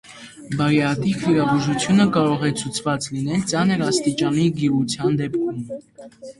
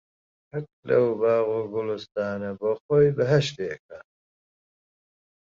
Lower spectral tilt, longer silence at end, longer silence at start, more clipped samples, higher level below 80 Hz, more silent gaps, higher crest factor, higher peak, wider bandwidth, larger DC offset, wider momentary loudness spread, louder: about the same, -5.5 dB/octave vs -6.5 dB/octave; second, 0.1 s vs 1.4 s; second, 0.1 s vs 0.55 s; neither; first, -54 dBFS vs -62 dBFS; second, none vs 0.73-0.83 s, 2.80-2.89 s, 3.79-3.89 s; about the same, 16 dB vs 18 dB; first, -4 dBFS vs -8 dBFS; first, 11.5 kHz vs 7.6 kHz; neither; second, 12 LU vs 15 LU; first, -20 LUFS vs -24 LUFS